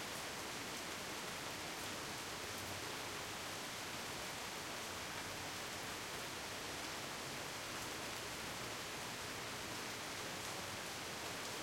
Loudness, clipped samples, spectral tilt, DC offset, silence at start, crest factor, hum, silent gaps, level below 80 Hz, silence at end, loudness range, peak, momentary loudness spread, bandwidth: -44 LUFS; under 0.1%; -2 dB/octave; under 0.1%; 0 s; 18 dB; none; none; -70 dBFS; 0 s; 0 LU; -28 dBFS; 1 LU; 16.5 kHz